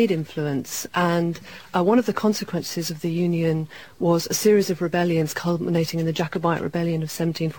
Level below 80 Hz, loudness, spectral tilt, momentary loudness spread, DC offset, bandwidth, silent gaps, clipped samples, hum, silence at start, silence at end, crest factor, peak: -60 dBFS; -23 LUFS; -5.5 dB/octave; 8 LU; 0.3%; 17.5 kHz; none; under 0.1%; none; 0 s; 0 s; 16 dB; -6 dBFS